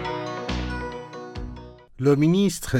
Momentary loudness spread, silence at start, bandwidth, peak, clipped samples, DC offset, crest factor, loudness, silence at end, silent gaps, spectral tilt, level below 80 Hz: 18 LU; 0 s; 17 kHz; -8 dBFS; under 0.1%; under 0.1%; 16 dB; -24 LUFS; 0 s; none; -6 dB/octave; -40 dBFS